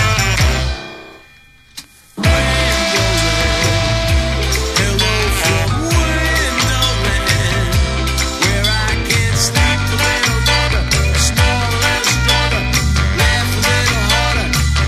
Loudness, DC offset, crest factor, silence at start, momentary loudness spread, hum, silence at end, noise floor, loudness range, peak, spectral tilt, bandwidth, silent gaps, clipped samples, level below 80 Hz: -14 LUFS; under 0.1%; 14 dB; 0 s; 4 LU; none; 0 s; -45 dBFS; 2 LU; 0 dBFS; -3.5 dB/octave; 15.5 kHz; none; under 0.1%; -20 dBFS